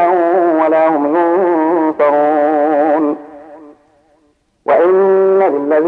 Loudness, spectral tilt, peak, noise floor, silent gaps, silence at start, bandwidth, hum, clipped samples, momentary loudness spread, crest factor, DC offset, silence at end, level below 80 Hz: -12 LUFS; -8.5 dB/octave; 0 dBFS; -57 dBFS; none; 0 s; 4.3 kHz; none; under 0.1%; 4 LU; 12 dB; under 0.1%; 0 s; -64 dBFS